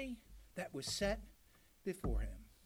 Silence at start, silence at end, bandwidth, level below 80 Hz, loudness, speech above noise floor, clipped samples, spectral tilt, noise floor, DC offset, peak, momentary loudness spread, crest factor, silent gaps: 0 s; 0.15 s; 16.5 kHz; -48 dBFS; -43 LUFS; 27 dB; under 0.1%; -4 dB/octave; -68 dBFS; under 0.1%; -26 dBFS; 14 LU; 18 dB; none